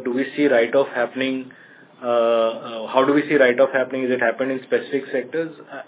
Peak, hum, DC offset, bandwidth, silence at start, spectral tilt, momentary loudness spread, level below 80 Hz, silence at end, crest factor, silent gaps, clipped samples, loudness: -2 dBFS; none; under 0.1%; 4 kHz; 0 s; -9 dB/octave; 11 LU; -80 dBFS; 0.05 s; 18 dB; none; under 0.1%; -20 LUFS